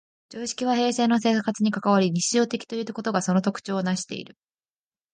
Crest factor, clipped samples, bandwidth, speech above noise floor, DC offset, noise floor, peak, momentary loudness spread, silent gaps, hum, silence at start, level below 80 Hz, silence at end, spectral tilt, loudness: 18 dB; under 0.1%; 10 kHz; over 66 dB; under 0.1%; under -90 dBFS; -8 dBFS; 11 LU; none; none; 0.3 s; -70 dBFS; 0.9 s; -4.5 dB/octave; -24 LUFS